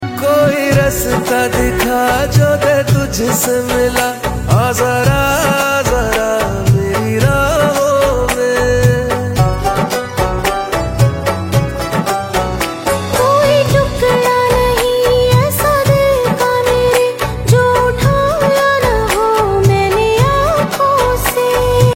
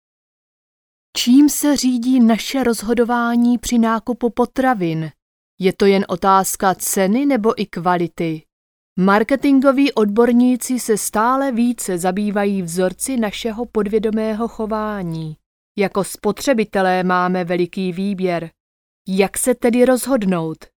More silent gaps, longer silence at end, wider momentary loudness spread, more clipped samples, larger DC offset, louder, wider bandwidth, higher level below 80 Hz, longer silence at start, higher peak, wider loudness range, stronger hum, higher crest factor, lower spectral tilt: second, none vs 5.22-5.58 s, 8.52-8.96 s, 15.46-15.75 s, 18.60-19.05 s; second, 0 s vs 0.25 s; second, 5 LU vs 8 LU; neither; neither; first, -13 LUFS vs -17 LUFS; second, 16.5 kHz vs over 20 kHz; first, -26 dBFS vs -48 dBFS; second, 0 s vs 1.15 s; about the same, 0 dBFS vs 0 dBFS; about the same, 3 LU vs 5 LU; neither; second, 12 dB vs 18 dB; about the same, -5 dB/octave vs -5 dB/octave